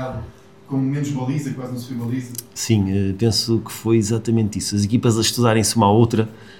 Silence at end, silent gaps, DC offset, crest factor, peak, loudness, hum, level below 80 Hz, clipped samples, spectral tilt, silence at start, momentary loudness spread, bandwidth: 0 s; none; 0.2%; 18 dB; -2 dBFS; -20 LUFS; none; -50 dBFS; under 0.1%; -5.5 dB/octave; 0 s; 12 LU; 17 kHz